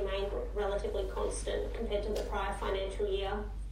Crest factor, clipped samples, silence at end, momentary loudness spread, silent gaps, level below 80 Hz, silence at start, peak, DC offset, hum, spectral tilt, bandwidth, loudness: 12 dB; under 0.1%; 0 s; 2 LU; none; -40 dBFS; 0 s; -22 dBFS; under 0.1%; none; -5 dB/octave; 14.5 kHz; -36 LUFS